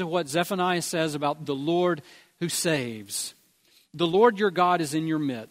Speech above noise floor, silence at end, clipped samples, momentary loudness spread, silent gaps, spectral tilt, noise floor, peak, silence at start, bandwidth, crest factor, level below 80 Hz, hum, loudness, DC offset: 37 dB; 0.05 s; under 0.1%; 11 LU; none; -4.5 dB/octave; -62 dBFS; -6 dBFS; 0 s; 16 kHz; 20 dB; -70 dBFS; none; -26 LUFS; under 0.1%